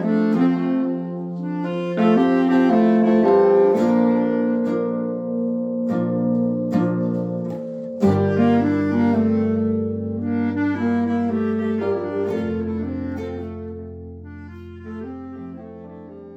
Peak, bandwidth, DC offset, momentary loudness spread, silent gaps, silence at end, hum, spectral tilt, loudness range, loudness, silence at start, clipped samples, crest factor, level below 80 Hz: -6 dBFS; 7.6 kHz; under 0.1%; 19 LU; none; 0 s; none; -9 dB/octave; 11 LU; -20 LUFS; 0 s; under 0.1%; 14 dB; -60 dBFS